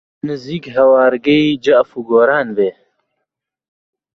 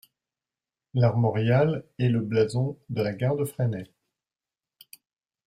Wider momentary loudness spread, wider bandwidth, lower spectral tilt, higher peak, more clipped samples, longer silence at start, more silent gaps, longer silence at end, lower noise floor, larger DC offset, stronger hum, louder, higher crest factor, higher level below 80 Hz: first, 12 LU vs 7 LU; second, 7 kHz vs 15 kHz; second, -6.5 dB/octave vs -8 dB/octave; first, -2 dBFS vs -8 dBFS; neither; second, 0.25 s vs 0.95 s; neither; second, 1.45 s vs 1.6 s; second, -77 dBFS vs under -90 dBFS; neither; neither; first, -14 LUFS vs -26 LUFS; about the same, 14 dB vs 18 dB; first, -56 dBFS vs -62 dBFS